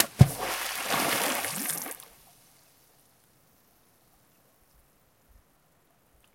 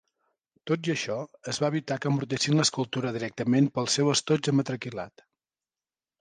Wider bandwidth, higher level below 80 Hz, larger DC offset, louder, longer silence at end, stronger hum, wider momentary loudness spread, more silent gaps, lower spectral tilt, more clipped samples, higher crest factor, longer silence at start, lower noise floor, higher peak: first, 17 kHz vs 10 kHz; first, -52 dBFS vs -68 dBFS; neither; about the same, -27 LUFS vs -27 LUFS; first, 4.4 s vs 1.1 s; neither; first, 16 LU vs 11 LU; neither; about the same, -4 dB/octave vs -4.5 dB/octave; neither; first, 32 dB vs 18 dB; second, 0 s vs 0.65 s; second, -66 dBFS vs under -90 dBFS; first, 0 dBFS vs -10 dBFS